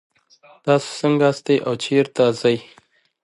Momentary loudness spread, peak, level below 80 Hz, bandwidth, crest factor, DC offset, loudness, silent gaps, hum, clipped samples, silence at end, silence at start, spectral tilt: 3 LU; -2 dBFS; -68 dBFS; 11.5 kHz; 18 dB; under 0.1%; -19 LUFS; none; none; under 0.1%; 0.6 s; 0.65 s; -5.5 dB/octave